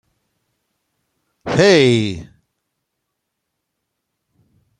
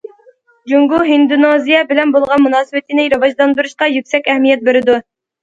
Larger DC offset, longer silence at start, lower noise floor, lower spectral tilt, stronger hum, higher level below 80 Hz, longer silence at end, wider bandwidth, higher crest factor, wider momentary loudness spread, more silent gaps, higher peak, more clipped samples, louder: neither; first, 1.45 s vs 0.65 s; first, -76 dBFS vs -48 dBFS; about the same, -5.5 dB/octave vs -4.5 dB/octave; neither; about the same, -54 dBFS vs -56 dBFS; first, 2.55 s vs 0.4 s; first, 10.5 kHz vs 7.8 kHz; first, 20 dB vs 12 dB; first, 22 LU vs 5 LU; neither; about the same, 0 dBFS vs 0 dBFS; neither; about the same, -14 LUFS vs -12 LUFS